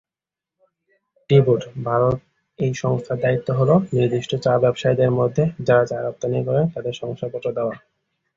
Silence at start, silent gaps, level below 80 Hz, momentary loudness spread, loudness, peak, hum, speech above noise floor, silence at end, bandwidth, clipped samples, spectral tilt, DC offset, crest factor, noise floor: 1.3 s; none; -54 dBFS; 10 LU; -20 LUFS; -2 dBFS; none; 70 dB; 0.6 s; 7.6 kHz; under 0.1%; -7.5 dB/octave; under 0.1%; 18 dB; -89 dBFS